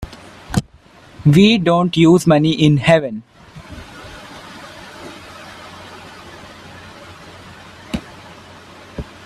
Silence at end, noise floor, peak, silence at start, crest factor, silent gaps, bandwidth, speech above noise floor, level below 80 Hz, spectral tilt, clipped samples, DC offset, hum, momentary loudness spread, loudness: 0.2 s; -45 dBFS; 0 dBFS; 0 s; 18 dB; none; 13 kHz; 33 dB; -44 dBFS; -6.5 dB/octave; under 0.1%; under 0.1%; none; 26 LU; -14 LUFS